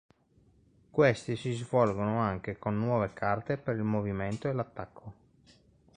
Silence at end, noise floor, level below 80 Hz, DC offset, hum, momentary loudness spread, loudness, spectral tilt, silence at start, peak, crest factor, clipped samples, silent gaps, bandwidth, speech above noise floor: 0.85 s; -65 dBFS; -58 dBFS; under 0.1%; none; 12 LU; -31 LUFS; -7.5 dB/octave; 0.95 s; -10 dBFS; 20 dB; under 0.1%; none; 10 kHz; 35 dB